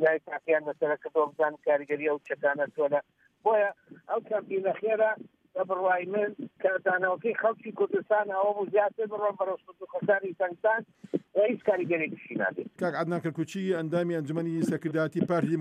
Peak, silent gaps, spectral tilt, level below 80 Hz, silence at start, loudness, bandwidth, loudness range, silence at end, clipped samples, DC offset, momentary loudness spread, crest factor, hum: -12 dBFS; none; -7.5 dB/octave; -82 dBFS; 0 s; -29 LUFS; 11 kHz; 2 LU; 0 s; under 0.1%; under 0.1%; 6 LU; 16 dB; none